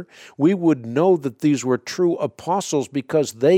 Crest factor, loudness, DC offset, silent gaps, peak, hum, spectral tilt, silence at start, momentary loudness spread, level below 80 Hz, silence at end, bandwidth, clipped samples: 14 dB; -21 LUFS; under 0.1%; none; -6 dBFS; none; -6 dB/octave; 0 s; 5 LU; -68 dBFS; 0 s; 15.5 kHz; under 0.1%